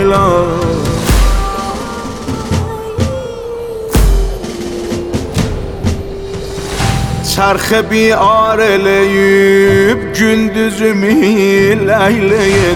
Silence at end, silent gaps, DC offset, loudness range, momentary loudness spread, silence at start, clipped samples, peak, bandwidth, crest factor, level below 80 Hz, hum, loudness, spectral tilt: 0 s; none; under 0.1%; 8 LU; 12 LU; 0 s; under 0.1%; 0 dBFS; 19.5 kHz; 12 dB; -20 dBFS; none; -12 LUFS; -5.5 dB/octave